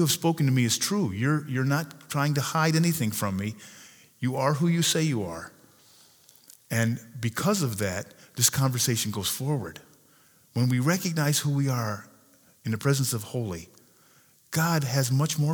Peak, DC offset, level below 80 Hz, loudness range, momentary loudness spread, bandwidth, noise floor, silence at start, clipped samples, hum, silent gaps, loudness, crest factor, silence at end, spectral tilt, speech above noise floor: -6 dBFS; under 0.1%; -66 dBFS; 3 LU; 12 LU; over 20 kHz; -60 dBFS; 0 s; under 0.1%; none; none; -26 LUFS; 20 dB; 0 s; -4.5 dB/octave; 34 dB